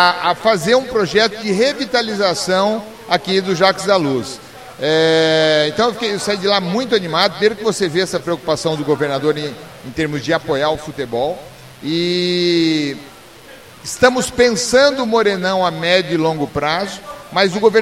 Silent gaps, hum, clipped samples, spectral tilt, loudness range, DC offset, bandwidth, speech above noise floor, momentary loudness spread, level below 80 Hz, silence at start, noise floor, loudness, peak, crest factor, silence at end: none; none; under 0.1%; -4 dB/octave; 4 LU; 0.2%; 16 kHz; 24 dB; 10 LU; -50 dBFS; 0 s; -40 dBFS; -16 LUFS; 0 dBFS; 16 dB; 0 s